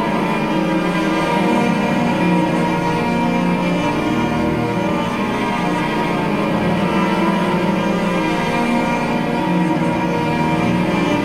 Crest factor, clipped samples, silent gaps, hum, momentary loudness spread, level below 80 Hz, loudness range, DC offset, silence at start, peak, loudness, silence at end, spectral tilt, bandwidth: 14 dB; under 0.1%; none; none; 2 LU; -42 dBFS; 1 LU; under 0.1%; 0 s; -4 dBFS; -17 LUFS; 0 s; -6.5 dB/octave; 15 kHz